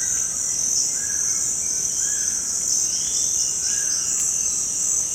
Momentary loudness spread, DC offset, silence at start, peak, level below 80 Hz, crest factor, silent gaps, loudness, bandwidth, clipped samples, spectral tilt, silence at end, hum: 2 LU; under 0.1%; 0 s; -8 dBFS; -52 dBFS; 14 dB; none; -19 LUFS; 16.5 kHz; under 0.1%; 1 dB/octave; 0 s; none